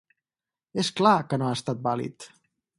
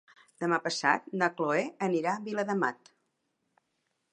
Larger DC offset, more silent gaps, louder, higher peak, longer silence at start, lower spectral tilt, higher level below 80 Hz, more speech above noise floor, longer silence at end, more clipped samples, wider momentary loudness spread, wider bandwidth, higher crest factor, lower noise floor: neither; neither; first, -25 LUFS vs -30 LUFS; first, -4 dBFS vs -10 dBFS; first, 0.75 s vs 0.4 s; about the same, -5.5 dB/octave vs -4.5 dB/octave; first, -68 dBFS vs -82 dBFS; first, over 65 dB vs 49 dB; second, 0.5 s vs 1.4 s; neither; first, 14 LU vs 5 LU; about the same, 11.5 kHz vs 10.5 kHz; about the same, 22 dB vs 22 dB; first, under -90 dBFS vs -79 dBFS